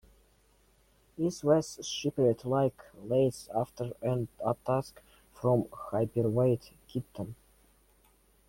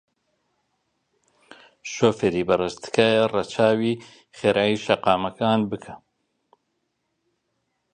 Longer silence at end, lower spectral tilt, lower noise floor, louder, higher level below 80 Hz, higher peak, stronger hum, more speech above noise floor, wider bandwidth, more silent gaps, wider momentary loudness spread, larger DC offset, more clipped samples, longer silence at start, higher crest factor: second, 1.15 s vs 1.95 s; about the same, -6.5 dB/octave vs -5.5 dB/octave; second, -66 dBFS vs -75 dBFS; second, -31 LUFS vs -22 LUFS; about the same, -62 dBFS vs -58 dBFS; second, -12 dBFS vs -2 dBFS; neither; second, 36 dB vs 53 dB; first, 16.5 kHz vs 9.8 kHz; neither; about the same, 12 LU vs 12 LU; neither; neither; second, 1.2 s vs 1.85 s; about the same, 20 dB vs 24 dB